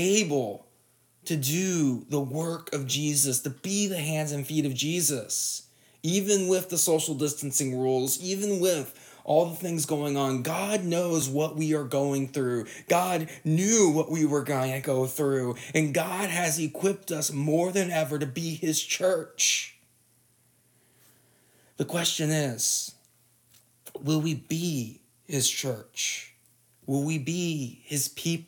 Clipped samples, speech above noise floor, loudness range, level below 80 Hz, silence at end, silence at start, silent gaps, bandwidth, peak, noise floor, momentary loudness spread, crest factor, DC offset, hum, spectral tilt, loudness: under 0.1%; 38 dB; 4 LU; -76 dBFS; 0.05 s; 0 s; none; 19.5 kHz; -10 dBFS; -65 dBFS; 8 LU; 18 dB; under 0.1%; none; -4 dB/octave; -27 LUFS